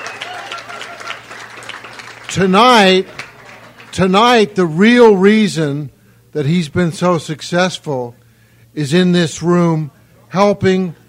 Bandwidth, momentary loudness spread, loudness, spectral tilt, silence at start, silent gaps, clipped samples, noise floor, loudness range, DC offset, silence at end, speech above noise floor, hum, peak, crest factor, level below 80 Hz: 15 kHz; 21 LU; -13 LUFS; -5.5 dB/octave; 0 s; none; under 0.1%; -48 dBFS; 6 LU; under 0.1%; 0.15 s; 36 dB; none; 0 dBFS; 14 dB; -50 dBFS